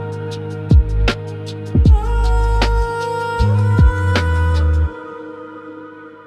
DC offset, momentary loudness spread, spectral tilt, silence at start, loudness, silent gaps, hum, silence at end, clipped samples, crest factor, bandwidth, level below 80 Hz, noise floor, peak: under 0.1%; 19 LU; -7 dB/octave; 0 s; -17 LUFS; none; none; 0.05 s; under 0.1%; 14 dB; 9.8 kHz; -18 dBFS; -36 dBFS; -2 dBFS